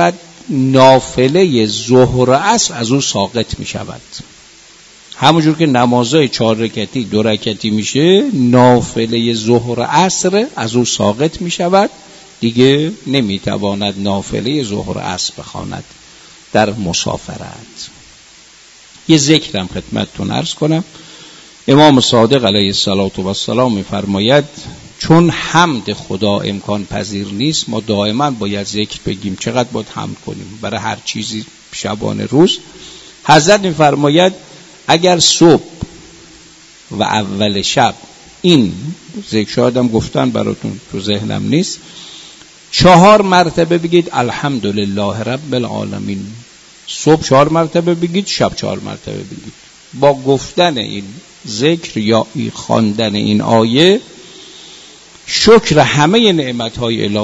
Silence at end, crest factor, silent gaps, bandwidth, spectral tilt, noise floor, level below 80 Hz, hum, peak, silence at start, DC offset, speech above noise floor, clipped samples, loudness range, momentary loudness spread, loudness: 0 s; 14 dB; none; 11 kHz; -4.5 dB/octave; -41 dBFS; -42 dBFS; none; 0 dBFS; 0 s; under 0.1%; 29 dB; 0.2%; 7 LU; 18 LU; -13 LUFS